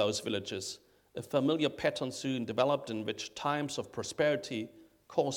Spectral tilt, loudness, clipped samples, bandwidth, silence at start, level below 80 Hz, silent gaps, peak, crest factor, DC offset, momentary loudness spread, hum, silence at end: -4.5 dB/octave; -34 LUFS; under 0.1%; 18.5 kHz; 0 s; -70 dBFS; none; -14 dBFS; 20 dB; under 0.1%; 10 LU; none; 0 s